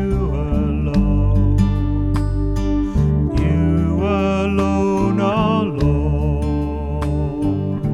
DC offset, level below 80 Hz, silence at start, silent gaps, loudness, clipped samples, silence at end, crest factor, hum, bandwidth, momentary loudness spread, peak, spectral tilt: under 0.1%; -24 dBFS; 0 s; none; -18 LUFS; under 0.1%; 0 s; 14 dB; none; 10.5 kHz; 4 LU; -4 dBFS; -8.5 dB/octave